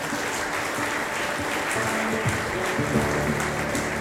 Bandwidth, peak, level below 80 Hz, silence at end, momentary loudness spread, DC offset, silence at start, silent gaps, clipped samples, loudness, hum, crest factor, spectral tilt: 16 kHz; -10 dBFS; -46 dBFS; 0 s; 3 LU; under 0.1%; 0 s; none; under 0.1%; -25 LUFS; none; 16 dB; -4 dB/octave